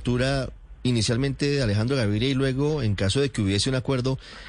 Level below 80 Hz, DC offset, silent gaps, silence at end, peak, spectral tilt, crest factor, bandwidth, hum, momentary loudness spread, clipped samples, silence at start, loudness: -42 dBFS; under 0.1%; none; 0 s; -12 dBFS; -5.5 dB/octave; 12 dB; 10 kHz; none; 3 LU; under 0.1%; 0 s; -24 LUFS